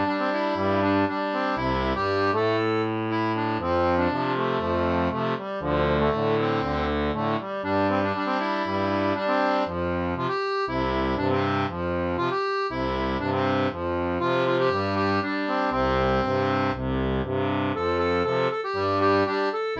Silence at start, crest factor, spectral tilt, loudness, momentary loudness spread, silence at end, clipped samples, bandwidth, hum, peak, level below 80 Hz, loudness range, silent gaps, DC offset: 0 s; 14 dB; -7.5 dB/octave; -25 LUFS; 4 LU; 0 s; under 0.1%; 7.8 kHz; none; -10 dBFS; -42 dBFS; 1 LU; none; under 0.1%